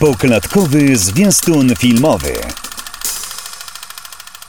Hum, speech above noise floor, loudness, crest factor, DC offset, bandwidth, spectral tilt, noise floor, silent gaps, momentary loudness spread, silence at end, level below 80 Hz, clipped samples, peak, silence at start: none; 22 dB; -12 LUFS; 12 dB; 1%; over 20 kHz; -4.5 dB/octave; -33 dBFS; none; 18 LU; 0.25 s; -36 dBFS; under 0.1%; -2 dBFS; 0 s